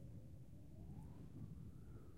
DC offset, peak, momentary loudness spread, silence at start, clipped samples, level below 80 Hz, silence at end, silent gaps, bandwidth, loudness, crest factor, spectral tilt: under 0.1%; -42 dBFS; 4 LU; 0 s; under 0.1%; -64 dBFS; 0 s; none; 15.5 kHz; -58 LUFS; 14 dB; -8.5 dB/octave